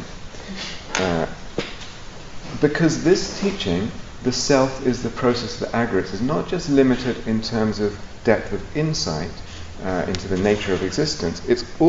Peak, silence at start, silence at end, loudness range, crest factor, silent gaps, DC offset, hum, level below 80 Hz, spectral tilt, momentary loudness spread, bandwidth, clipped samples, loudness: -2 dBFS; 0 s; 0 s; 3 LU; 20 dB; none; under 0.1%; none; -38 dBFS; -5 dB/octave; 14 LU; 8 kHz; under 0.1%; -22 LUFS